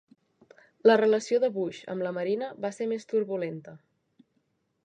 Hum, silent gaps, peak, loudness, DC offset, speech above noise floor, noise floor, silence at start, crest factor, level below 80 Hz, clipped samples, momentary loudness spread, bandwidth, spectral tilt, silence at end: none; none; -8 dBFS; -27 LUFS; under 0.1%; 48 dB; -74 dBFS; 0.85 s; 22 dB; -82 dBFS; under 0.1%; 12 LU; 9.4 kHz; -5.5 dB/octave; 1.1 s